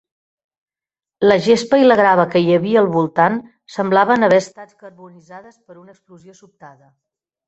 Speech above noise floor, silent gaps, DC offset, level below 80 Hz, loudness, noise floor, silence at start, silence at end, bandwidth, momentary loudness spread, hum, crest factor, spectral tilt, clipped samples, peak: over 74 dB; none; under 0.1%; -60 dBFS; -14 LUFS; under -90 dBFS; 1.2 s; 0.8 s; 8.2 kHz; 9 LU; none; 16 dB; -6 dB/octave; under 0.1%; 0 dBFS